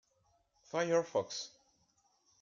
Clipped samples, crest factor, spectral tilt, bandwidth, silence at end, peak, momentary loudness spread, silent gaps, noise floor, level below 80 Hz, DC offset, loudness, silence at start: under 0.1%; 20 dB; -4 dB/octave; 7.6 kHz; 0.95 s; -20 dBFS; 11 LU; none; -75 dBFS; -82 dBFS; under 0.1%; -36 LUFS; 0.75 s